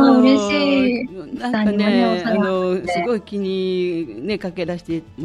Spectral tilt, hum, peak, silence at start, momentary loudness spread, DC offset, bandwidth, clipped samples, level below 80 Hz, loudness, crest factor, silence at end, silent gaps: -6 dB/octave; none; -2 dBFS; 0 s; 11 LU; under 0.1%; 10.5 kHz; under 0.1%; -52 dBFS; -19 LUFS; 16 dB; 0 s; none